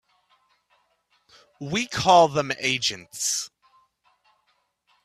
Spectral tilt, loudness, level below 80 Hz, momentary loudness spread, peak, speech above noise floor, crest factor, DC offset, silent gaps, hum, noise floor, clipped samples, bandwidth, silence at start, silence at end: -2.5 dB/octave; -22 LUFS; -62 dBFS; 12 LU; -4 dBFS; 48 dB; 22 dB; under 0.1%; none; none; -70 dBFS; under 0.1%; 15 kHz; 1.6 s; 1.55 s